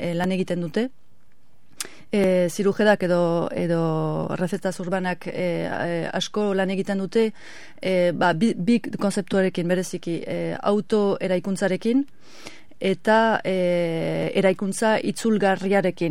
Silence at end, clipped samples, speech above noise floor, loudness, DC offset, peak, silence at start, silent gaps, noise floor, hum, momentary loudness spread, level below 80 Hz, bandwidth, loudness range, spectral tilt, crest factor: 0 s; under 0.1%; 40 dB; -23 LUFS; 1%; -6 dBFS; 0 s; none; -62 dBFS; none; 8 LU; -62 dBFS; 16 kHz; 3 LU; -6 dB/octave; 16 dB